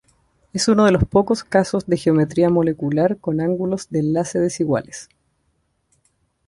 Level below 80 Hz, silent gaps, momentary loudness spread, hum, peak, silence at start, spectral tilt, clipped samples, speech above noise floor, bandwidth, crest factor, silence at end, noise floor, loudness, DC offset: -42 dBFS; none; 8 LU; none; -2 dBFS; 0.55 s; -6 dB/octave; under 0.1%; 49 dB; 11.5 kHz; 16 dB; 1.45 s; -67 dBFS; -19 LUFS; under 0.1%